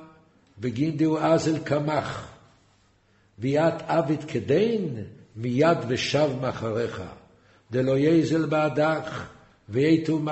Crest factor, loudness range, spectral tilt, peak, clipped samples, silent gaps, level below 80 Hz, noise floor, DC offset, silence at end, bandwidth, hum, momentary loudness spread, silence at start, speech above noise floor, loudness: 18 dB; 3 LU; -6.5 dB/octave; -8 dBFS; under 0.1%; none; -60 dBFS; -62 dBFS; under 0.1%; 0 s; 8.2 kHz; none; 13 LU; 0 s; 38 dB; -25 LUFS